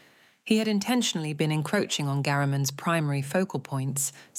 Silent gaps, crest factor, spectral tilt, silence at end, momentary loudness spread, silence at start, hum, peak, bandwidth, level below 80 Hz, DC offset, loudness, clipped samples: none; 16 dB; -4.5 dB/octave; 0 s; 5 LU; 0.45 s; none; -12 dBFS; 16.5 kHz; -74 dBFS; under 0.1%; -27 LUFS; under 0.1%